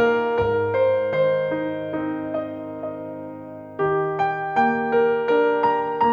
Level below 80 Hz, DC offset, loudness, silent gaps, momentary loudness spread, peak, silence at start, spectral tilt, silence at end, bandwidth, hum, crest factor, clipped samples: -54 dBFS; under 0.1%; -22 LUFS; none; 12 LU; -8 dBFS; 0 s; -8 dB/octave; 0 s; 6.6 kHz; none; 14 dB; under 0.1%